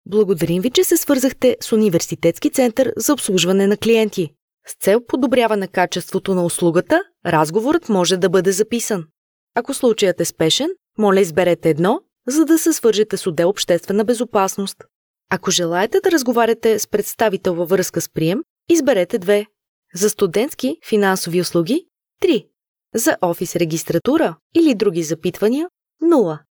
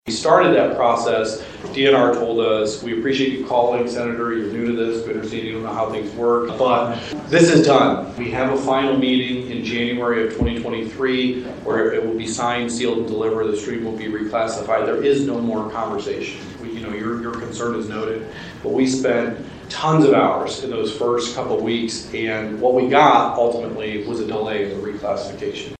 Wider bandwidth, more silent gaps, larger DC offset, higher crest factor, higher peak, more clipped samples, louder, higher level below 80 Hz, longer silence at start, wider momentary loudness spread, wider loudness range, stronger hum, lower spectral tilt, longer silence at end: first, over 20 kHz vs 9.4 kHz; first, 4.42-4.48 s, 4.54-4.58 s, 9.17-9.47 s, 14.95-15.14 s, 18.50-18.56 s, 19.68-19.82 s, 22.68-22.75 s, 24.41-24.50 s vs none; neither; about the same, 16 dB vs 20 dB; about the same, -2 dBFS vs 0 dBFS; neither; first, -17 LUFS vs -20 LUFS; second, -56 dBFS vs -46 dBFS; about the same, 0.1 s vs 0.05 s; second, 6 LU vs 12 LU; about the same, 3 LU vs 5 LU; neither; about the same, -4.5 dB/octave vs -5 dB/octave; about the same, 0.15 s vs 0.05 s